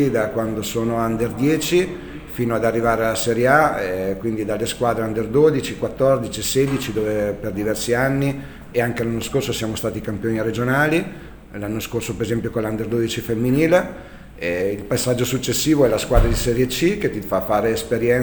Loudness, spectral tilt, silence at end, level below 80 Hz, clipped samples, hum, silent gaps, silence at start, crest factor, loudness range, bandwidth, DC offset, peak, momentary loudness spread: -20 LUFS; -5 dB/octave; 0 s; -34 dBFS; under 0.1%; none; none; 0 s; 20 dB; 3 LU; over 20 kHz; under 0.1%; 0 dBFS; 9 LU